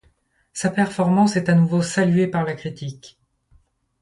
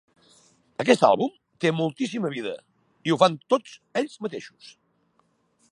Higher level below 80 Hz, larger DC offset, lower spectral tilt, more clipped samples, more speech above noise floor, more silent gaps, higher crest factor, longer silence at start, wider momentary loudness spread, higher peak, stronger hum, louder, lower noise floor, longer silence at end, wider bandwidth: first, -58 dBFS vs -74 dBFS; neither; about the same, -6.5 dB/octave vs -5.5 dB/octave; neither; about the same, 43 dB vs 44 dB; neither; second, 16 dB vs 24 dB; second, 0.55 s vs 0.8 s; about the same, 15 LU vs 16 LU; about the same, -4 dBFS vs -2 dBFS; neither; first, -20 LUFS vs -24 LUFS; second, -62 dBFS vs -68 dBFS; second, 0.95 s vs 1.25 s; about the same, 11.5 kHz vs 11.5 kHz